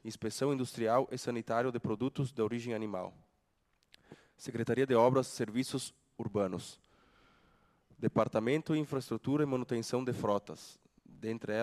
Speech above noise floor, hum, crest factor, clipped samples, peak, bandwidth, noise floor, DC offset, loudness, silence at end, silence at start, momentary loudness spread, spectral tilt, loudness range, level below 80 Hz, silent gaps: 43 dB; none; 22 dB; under 0.1%; -14 dBFS; 13 kHz; -76 dBFS; under 0.1%; -34 LUFS; 0 s; 0.05 s; 13 LU; -6 dB/octave; 4 LU; -72 dBFS; none